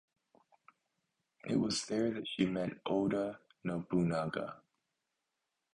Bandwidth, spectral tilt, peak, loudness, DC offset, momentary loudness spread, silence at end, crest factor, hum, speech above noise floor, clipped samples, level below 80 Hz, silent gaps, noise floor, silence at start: 10.5 kHz; -5.5 dB/octave; -18 dBFS; -36 LUFS; under 0.1%; 10 LU; 1.2 s; 20 dB; none; 52 dB; under 0.1%; -68 dBFS; none; -87 dBFS; 1.45 s